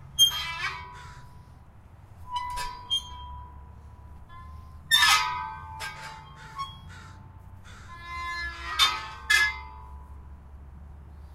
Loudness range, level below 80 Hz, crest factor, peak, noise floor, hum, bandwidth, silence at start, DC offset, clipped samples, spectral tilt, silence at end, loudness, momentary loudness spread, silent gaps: 9 LU; -48 dBFS; 24 dB; -6 dBFS; -50 dBFS; none; 16 kHz; 0 s; under 0.1%; under 0.1%; 0.5 dB/octave; 0 s; -25 LUFS; 27 LU; none